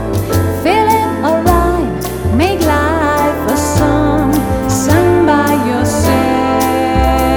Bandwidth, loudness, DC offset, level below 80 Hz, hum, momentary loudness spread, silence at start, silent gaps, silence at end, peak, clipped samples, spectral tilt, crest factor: over 20 kHz; -12 LUFS; under 0.1%; -24 dBFS; none; 4 LU; 0 s; none; 0 s; 0 dBFS; under 0.1%; -5.5 dB/octave; 12 dB